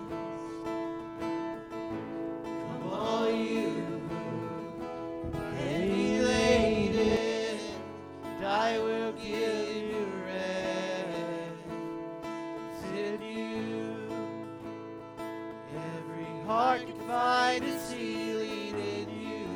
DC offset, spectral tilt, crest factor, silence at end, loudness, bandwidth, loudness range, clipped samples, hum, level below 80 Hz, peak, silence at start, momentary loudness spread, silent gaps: under 0.1%; -5 dB/octave; 20 dB; 0 s; -33 LUFS; over 20 kHz; 8 LU; under 0.1%; none; -56 dBFS; -12 dBFS; 0 s; 12 LU; none